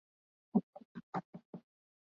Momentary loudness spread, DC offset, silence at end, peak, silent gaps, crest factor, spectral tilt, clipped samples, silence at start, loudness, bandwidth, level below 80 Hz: 18 LU; under 0.1%; 0.55 s; -20 dBFS; 0.63-0.73 s, 0.85-0.95 s, 1.03-1.13 s, 1.25-1.33 s, 1.45-1.53 s; 24 dB; -9 dB/octave; under 0.1%; 0.55 s; -40 LUFS; 6.8 kHz; -82 dBFS